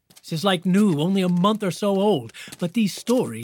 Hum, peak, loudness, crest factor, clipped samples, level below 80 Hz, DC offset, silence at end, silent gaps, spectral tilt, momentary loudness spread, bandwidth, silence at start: none; -6 dBFS; -22 LUFS; 16 dB; under 0.1%; -70 dBFS; under 0.1%; 0 s; none; -6 dB/octave; 8 LU; 18 kHz; 0.25 s